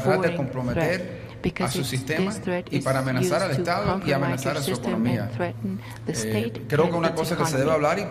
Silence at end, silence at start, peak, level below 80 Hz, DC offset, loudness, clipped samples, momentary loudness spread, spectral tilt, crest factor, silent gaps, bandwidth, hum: 0 s; 0 s; -8 dBFS; -50 dBFS; under 0.1%; -25 LUFS; under 0.1%; 7 LU; -5.5 dB/octave; 18 dB; none; 15.5 kHz; none